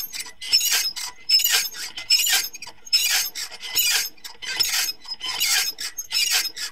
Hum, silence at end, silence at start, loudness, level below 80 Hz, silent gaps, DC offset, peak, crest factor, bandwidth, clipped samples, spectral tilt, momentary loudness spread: none; 0 s; 0 s; -20 LUFS; -60 dBFS; none; 0.7%; -4 dBFS; 20 dB; 16.5 kHz; under 0.1%; 3.5 dB/octave; 14 LU